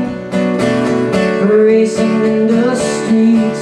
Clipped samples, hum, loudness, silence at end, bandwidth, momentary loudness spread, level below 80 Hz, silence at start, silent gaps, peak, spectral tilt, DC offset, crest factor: under 0.1%; none; -12 LUFS; 0 s; 11 kHz; 5 LU; -48 dBFS; 0 s; none; -2 dBFS; -6 dB/octave; under 0.1%; 10 dB